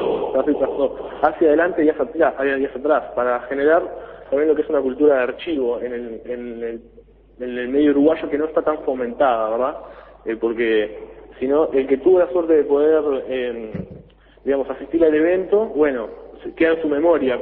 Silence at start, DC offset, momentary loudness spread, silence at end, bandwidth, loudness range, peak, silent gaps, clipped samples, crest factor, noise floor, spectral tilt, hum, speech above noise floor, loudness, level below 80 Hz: 0 s; under 0.1%; 14 LU; 0 s; 4.1 kHz; 3 LU; -2 dBFS; none; under 0.1%; 18 dB; -45 dBFS; -10 dB/octave; none; 26 dB; -19 LUFS; -50 dBFS